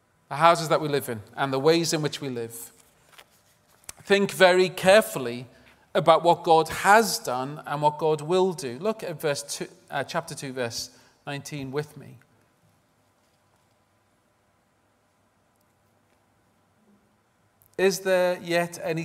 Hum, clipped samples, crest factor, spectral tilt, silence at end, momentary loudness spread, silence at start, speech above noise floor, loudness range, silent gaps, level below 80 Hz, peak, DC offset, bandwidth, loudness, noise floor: none; under 0.1%; 24 dB; -4 dB/octave; 0 s; 17 LU; 0.3 s; 43 dB; 14 LU; none; -66 dBFS; -2 dBFS; under 0.1%; 16 kHz; -24 LUFS; -67 dBFS